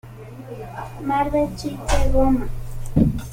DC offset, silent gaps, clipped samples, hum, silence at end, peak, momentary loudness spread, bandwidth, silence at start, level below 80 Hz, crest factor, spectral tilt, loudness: under 0.1%; none; under 0.1%; none; 0 s; -4 dBFS; 16 LU; 16 kHz; 0.05 s; -26 dBFS; 16 dB; -6.5 dB/octave; -22 LUFS